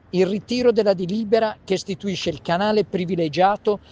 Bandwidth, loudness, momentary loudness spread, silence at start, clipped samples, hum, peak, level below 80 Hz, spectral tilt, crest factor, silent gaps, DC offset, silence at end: 9.4 kHz; -21 LUFS; 7 LU; 0.15 s; under 0.1%; none; -4 dBFS; -54 dBFS; -6 dB/octave; 16 dB; none; under 0.1%; 0.15 s